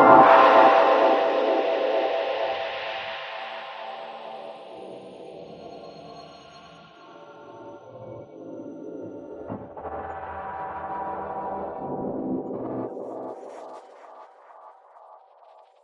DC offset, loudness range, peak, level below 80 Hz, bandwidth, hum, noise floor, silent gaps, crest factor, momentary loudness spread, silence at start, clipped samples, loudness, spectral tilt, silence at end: under 0.1%; 20 LU; -2 dBFS; -64 dBFS; 7 kHz; none; -53 dBFS; none; 24 dB; 25 LU; 0 s; under 0.1%; -22 LUFS; -6 dB/octave; 1.1 s